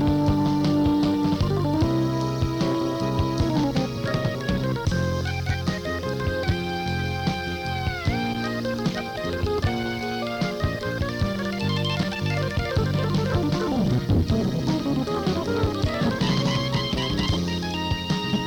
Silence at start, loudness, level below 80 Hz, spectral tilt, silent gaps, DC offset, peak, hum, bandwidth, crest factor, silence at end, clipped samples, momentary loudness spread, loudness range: 0 s; -25 LUFS; -38 dBFS; -6.5 dB/octave; none; under 0.1%; -10 dBFS; none; 18.5 kHz; 14 dB; 0 s; under 0.1%; 5 LU; 3 LU